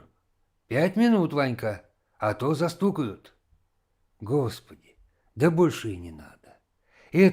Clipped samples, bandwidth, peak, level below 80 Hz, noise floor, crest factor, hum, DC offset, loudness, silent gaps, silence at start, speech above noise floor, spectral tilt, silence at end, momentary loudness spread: under 0.1%; 16 kHz; -8 dBFS; -62 dBFS; -71 dBFS; 20 dB; none; under 0.1%; -26 LUFS; none; 0.7 s; 46 dB; -7 dB/octave; 0 s; 18 LU